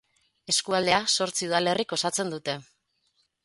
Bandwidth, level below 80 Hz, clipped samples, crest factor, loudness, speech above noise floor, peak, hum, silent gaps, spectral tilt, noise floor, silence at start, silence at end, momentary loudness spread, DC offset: 12 kHz; -66 dBFS; under 0.1%; 22 dB; -25 LUFS; 45 dB; -6 dBFS; none; none; -2 dB/octave; -72 dBFS; 0.5 s; 0.8 s; 9 LU; under 0.1%